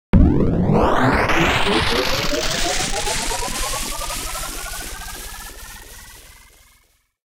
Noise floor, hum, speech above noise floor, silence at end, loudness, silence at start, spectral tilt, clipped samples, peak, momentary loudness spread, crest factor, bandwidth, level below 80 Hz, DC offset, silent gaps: -59 dBFS; none; 40 dB; 1.05 s; -19 LUFS; 0.15 s; -4 dB/octave; under 0.1%; 0 dBFS; 18 LU; 20 dB; 18 kHz; -28 dBFS; under 0.1%; none